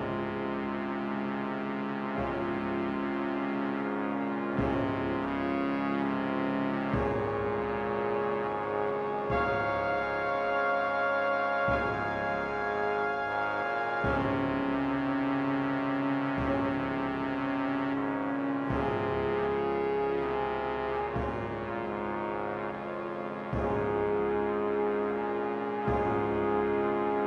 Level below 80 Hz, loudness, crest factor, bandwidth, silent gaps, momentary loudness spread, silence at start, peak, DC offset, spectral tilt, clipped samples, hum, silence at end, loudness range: -50 dBFS; -31 LUFS; 14 dB; 6.8 kHz; none; 5 LU; 0 s; -16 dBFS; under 0.1%; -8 dB/octave; under 0.1%; none; 0 s; 3 LU